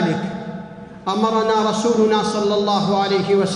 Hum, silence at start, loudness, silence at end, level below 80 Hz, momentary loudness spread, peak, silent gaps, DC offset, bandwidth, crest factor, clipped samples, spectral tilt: none; 0 s; -18 LUFS; 0 s; -56 dBFS; 13 LU; -6 dBFS; none; under 0.1%; 11 kHz; 14 dB; under 0.1%; -5.5 dB/octave